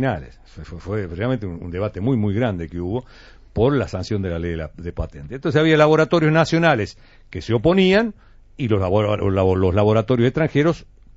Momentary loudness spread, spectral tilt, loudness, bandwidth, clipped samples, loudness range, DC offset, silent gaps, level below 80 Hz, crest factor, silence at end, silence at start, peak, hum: 15 LU; -6 dB/octave; -19 LUFS; 8 kHz; under 0.1%; 7 LU; under 0.1%; none; -40 dBFS; 18 dB; 0.35 s; 0 s; -2 dBFS; none